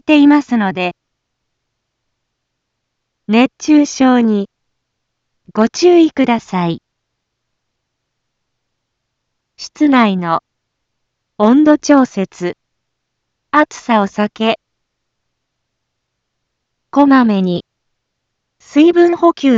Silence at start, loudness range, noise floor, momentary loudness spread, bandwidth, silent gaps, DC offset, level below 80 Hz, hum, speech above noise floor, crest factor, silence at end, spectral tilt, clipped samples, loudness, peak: 0.1 s; 6 LU; -73 dBFS; 12 LU; 7.6 kHz; none; under 0.1%; -60 dBFS; none; 62 dB; 14 dB; 0 s; -5.5 dB/octave; under 0.1%; -13 LUFS; 0 dBFS